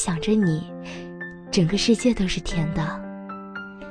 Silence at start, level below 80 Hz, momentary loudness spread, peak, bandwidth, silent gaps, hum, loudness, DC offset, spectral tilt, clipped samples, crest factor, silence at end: 0 s; -40 dBFS; 16 LU; -8 dBFS; 10.5 kHz; none; none; -23 LUFS; under 0.1%; -5.5 dB/octave; under 0.1%; 16 dB; 0 s